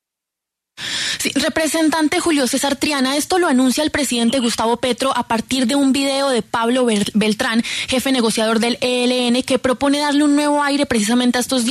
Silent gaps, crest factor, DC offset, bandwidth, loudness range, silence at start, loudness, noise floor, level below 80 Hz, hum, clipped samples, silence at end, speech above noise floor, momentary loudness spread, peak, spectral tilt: none; 12 dB; under 0.1%; 13.5 kHz; 1 LU; 0.8 s; -17 LUFS; -83 dBFS; -50 dBFS; none; under 0.1%; 0 s; 66 dB; 3 LU; -4 dBFS; -3 dB/octave